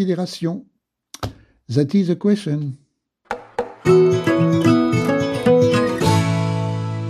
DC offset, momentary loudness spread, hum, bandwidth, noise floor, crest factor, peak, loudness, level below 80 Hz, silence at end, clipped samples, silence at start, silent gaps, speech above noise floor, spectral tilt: under 0.1%; 17 LU; none; 14 kHz; -45 dBFS; 16 dB; -2 dBFS; -18 LUFS; -50 dBFS; 0 s; under 0.1%; 0 s; none; 26 dB; -7 dB/octave